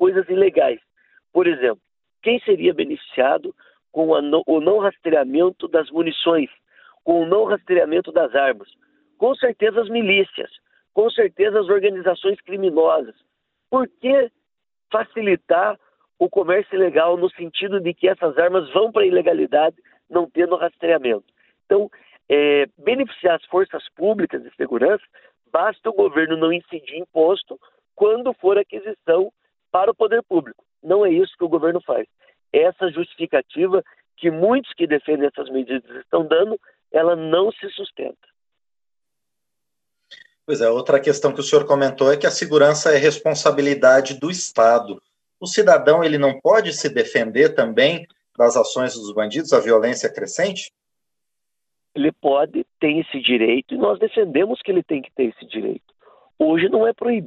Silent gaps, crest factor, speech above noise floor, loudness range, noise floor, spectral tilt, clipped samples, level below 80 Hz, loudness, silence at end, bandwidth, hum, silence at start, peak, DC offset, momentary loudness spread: none; 18 dB; over 72 dB; 5 LU; under -90 dBFS; -4.5 dB/octave; under 0.1%; -68 dBFS; -19 LUFS; 0 s; 8.6 kHz; none; 0 s; 0 dBFS; under 0.1%; 10 LU